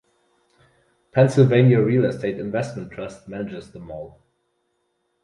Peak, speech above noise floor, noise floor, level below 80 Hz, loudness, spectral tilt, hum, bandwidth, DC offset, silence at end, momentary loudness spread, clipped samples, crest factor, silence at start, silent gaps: -4 dBFS; 52 dB; -71 dBFS; -56 dBFS; -19 LUFS; -8 dB/octave; none; 10.5 kHz; under 0.1%; 1.15 s; 22 LU; under 0.1%; 20 dB; 1.15 s; none